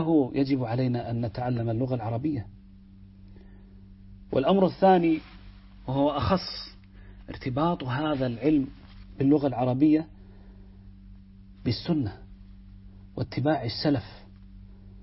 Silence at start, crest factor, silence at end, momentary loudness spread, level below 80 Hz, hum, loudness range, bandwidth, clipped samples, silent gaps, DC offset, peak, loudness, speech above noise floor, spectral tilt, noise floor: 0 s; 20 dB; 0.05 s; 14 LU; -50 dBFS; none; 7 LU; 5.8 kHz; under 0.1%; none; under 0.1%; -8 dBFS; -26 LUFS; 24 dB; -10.5 dB/octave; -50 dBFS